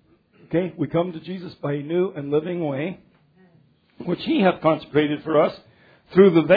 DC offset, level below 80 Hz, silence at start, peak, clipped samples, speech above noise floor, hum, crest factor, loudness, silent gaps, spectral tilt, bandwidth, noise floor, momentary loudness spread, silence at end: under 0.1%; -60 dBFS; 0.5 s; -2 dBFS; under 0.1%; 38 dB; none; 20 dB; -22 LUFS; none; -10 dB/octave; 5 kHz; -58 dBFS; 14 LU; 0 s